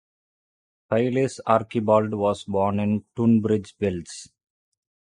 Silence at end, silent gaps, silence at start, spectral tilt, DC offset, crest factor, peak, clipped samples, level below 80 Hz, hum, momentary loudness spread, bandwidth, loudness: 0.85 s; none; 0.9 s; -7 dB/octave; under 0.1%; 20 dB; -4 dBFS; under 0.1%; -54 dBFS; none; 7 LU; 10.5 kHz; -23 LUFS